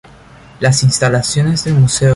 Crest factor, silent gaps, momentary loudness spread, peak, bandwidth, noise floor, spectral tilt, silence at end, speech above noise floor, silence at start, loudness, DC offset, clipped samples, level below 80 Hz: 12 dB; none; 3 LU; -2 dBFS; 11.5 kHz; -39 dBFS; -4.5 dB/octave; 0 s; 28 dB; 0.6 s; -13 LUFS; under 0.1%; under 0.1%; -40 dBFS